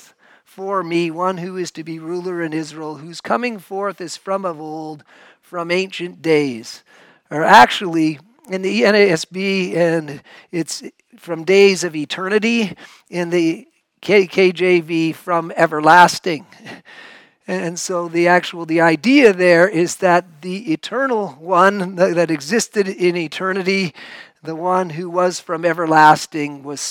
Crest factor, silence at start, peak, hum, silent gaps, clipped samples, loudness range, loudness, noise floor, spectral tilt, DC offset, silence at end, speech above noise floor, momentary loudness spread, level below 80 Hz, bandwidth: 18 dB; 0.6 s; 0 dBFS; none; none; 0.2%; 9 LU; -16 LUFS; -50 dBFS; -4.5 dB/octave; under 0.1%; 0 s; 33 dB; 18 LU; -64 dBFS; 17.5 kHz